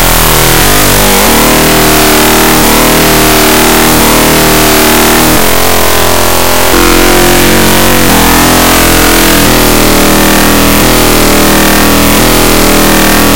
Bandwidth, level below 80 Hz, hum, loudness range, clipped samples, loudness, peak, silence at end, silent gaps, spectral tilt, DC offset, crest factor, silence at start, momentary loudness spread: over 20 kHz; -16 dBFS; none; 1 LU; 8%; -4 LUFS; 0 dBFS; 0 s; none; -3 dB/octave; 20%; 6 dB; 0 s; 1 LU